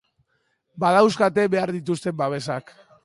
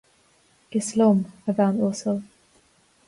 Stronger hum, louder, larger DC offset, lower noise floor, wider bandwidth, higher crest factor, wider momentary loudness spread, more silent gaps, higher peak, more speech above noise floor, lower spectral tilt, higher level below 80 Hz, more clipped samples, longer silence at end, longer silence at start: neither; about the same, -22 LUFS vs -23 LUFS; neither; first, -71 dBFS vs -61 dBFS; about the same, 11.5 kHz vs 11.5 kHz; about the same, 18 dB vs 16 dB; about the same, 11 LU vs 9 LU; neither; first, -4 dBFS vs -8 dBFS; first, 50 dB vs 39 dB; about the same, -6 dB/octave vs -6.5 dB/octave; about the same, -66 dBFS vs -66 dBFS; neither; second, 0.45 s vs 0.85 s; about the same, 0.75 s vs 0.7 s